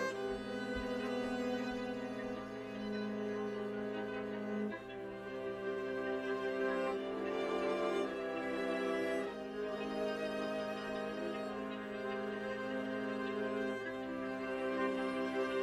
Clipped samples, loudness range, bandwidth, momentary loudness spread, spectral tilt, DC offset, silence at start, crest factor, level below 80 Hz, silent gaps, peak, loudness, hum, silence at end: under 0.1%; 3 LU; 14 kHz; 6 LU; -5.5 dB/octave; under 0.1%; 0 s; 16 dB; -66 dBFS; none; -24 dBFS; -39 LUFS; none; 0 s